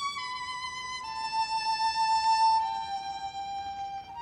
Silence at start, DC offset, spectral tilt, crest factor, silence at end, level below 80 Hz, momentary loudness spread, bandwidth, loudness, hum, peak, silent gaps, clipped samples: 0 s; under 0.1%; 0 dB/octave; 14 dB; 0 s; -62 dBFS; 12 LU; 10.5 kHz; -30 LUFS; none; -16 dBFS; none; under 0.1%